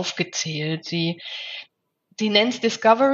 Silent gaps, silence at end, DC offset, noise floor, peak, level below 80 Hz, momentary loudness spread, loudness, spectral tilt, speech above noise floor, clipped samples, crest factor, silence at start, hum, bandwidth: none; 0 s; under 0.1%; -66 dBFS; -4 dBFS; -78 dBFS; 14 LU; -22 LUFS; -4 dB/octave; 44 dB; under 0.1%; 20 dB; 0 s; none; 7.8 kHz